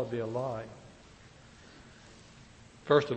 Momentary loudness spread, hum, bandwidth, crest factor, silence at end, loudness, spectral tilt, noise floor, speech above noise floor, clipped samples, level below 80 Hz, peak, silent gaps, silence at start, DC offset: 25 LU; none; 8.4 kHz; 24 dB; 0 s; -32 LUFS; -6.5 dB/octave; -55 dBFS; 25 dB; under 0.1%; -64 dBFS; -12 dBFS; none; 0 s; under 0.1%